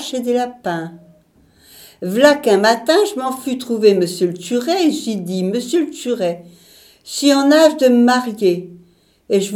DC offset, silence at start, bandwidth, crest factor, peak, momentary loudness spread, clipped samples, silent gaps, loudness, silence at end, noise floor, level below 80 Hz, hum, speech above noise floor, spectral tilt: under 0.1%; 0 s; 18 kHz; 16 dB; 0 dBFS; 12 LU; under 0.1%; none; -16 LUFS; 0 s; -52 dBFS; -64 dBFS; none; 37 dB; -4.5 dB/octave